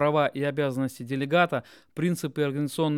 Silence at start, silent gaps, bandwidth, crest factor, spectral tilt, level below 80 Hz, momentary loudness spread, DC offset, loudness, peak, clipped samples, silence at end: 0 s; none; 16.5 kHz; 18 dB; -6 dB/octave; -70 dBFS; 8 LU; under 0.1%; -27 LUFS; -8 dBFS; under 0.1%; 0 s